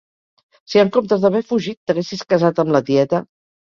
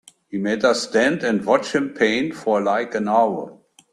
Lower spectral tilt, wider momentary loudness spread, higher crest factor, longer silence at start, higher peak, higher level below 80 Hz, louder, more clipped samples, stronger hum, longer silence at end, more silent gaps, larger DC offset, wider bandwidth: first, -6.5 dB/octave vs -4.5 dB/octave; about the same, 7 LU vs 7 LU; about the same, 16 dB vs 18 dB; first, 0.7 s vs 0.3 s; about the same, -2 dBFS vs -4 dBFS; about the same, -60 dBFS vs -62 dBFS; about the same, -18 LUFS vs -20 LUFS; neither; neither; about the same, 0.45 s vs 0.4 s; first, 1.77-1.87 s vs none; neither; second, 7.2 kHz vs 12.5 kHz